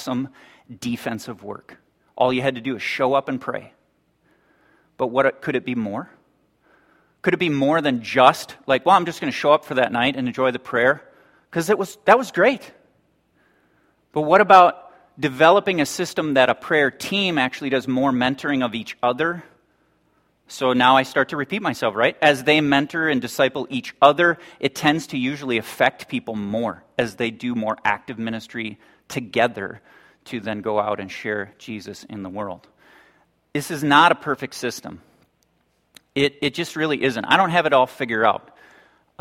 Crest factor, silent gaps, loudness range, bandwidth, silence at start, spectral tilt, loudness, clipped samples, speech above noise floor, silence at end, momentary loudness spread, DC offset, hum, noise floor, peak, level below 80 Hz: 22 dB; none; 8 LU; 16.5 kHz; 0 s; -4.5 dB/octave; -20 LUFS; under 0.1%; 46 dB; 0.8 s; 15 LU; under 0.1%; none; -66 dBFS; 0 dBFS; -62 dBFS